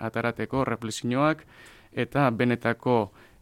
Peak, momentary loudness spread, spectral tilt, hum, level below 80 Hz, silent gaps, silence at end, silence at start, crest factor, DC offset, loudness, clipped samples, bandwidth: -8 dBFS; 9 LU; -6 dB/octave; none; -56 dBFS; none; 0.35 s; 0 s; 18 dB; under 0.1%; -27 LUFS; under 0.1%; 15.5 kHz